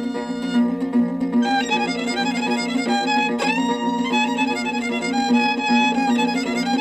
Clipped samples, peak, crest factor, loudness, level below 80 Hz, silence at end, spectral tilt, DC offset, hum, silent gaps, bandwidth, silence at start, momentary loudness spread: under 0.1%; -8 dBFS; 14 dB; -20 LUFS; -58 dBFS; 0 s; -4 dB/octave; under 0.1%; none; none; 10 kHz; 0 s; 4 LU